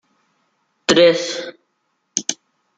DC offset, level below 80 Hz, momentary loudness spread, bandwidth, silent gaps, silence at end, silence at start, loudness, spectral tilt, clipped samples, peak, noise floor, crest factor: under 0.1%; -60 dBFS; 19 LU; 9.4 kHz; none; 0.45 s; 0.9 s; -17 LUFS; -2.5 dB/octave; under 0.1%; 0 dBFS; -70 dBFS; 20 dB